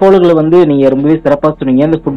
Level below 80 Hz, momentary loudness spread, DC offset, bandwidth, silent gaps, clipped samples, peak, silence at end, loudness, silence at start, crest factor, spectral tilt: -38 dBFS; 4 LU; under 0.1%; 6.4 kHz; none; under 0.1%; 0 dBFS; 0 s; -9 LUFS; 0 s; 8 dB; -9 dB/octave